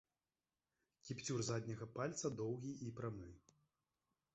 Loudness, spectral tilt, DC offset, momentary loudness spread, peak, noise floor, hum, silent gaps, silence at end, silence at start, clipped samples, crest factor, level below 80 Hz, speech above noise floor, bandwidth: -46 LUFS; -6 dB/octave; under 0.1%; 11 LU; -30 dBFS; under -90 dBFS; none; none; 0.95 s; 1.05 s; under 0.1%; 18 dB; -74 dBFS; over 45 dB; 8 kHz